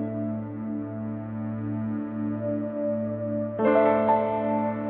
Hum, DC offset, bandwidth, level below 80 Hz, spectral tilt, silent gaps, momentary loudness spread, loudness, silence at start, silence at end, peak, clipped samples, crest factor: none; under 0.1%; 4.1 kHz; -62 dBFS; -8 dB/octave; none; 11 LU; -27 LUFS; 0 s; 0 s; -8 dBFS; under 0.1%; 18 dB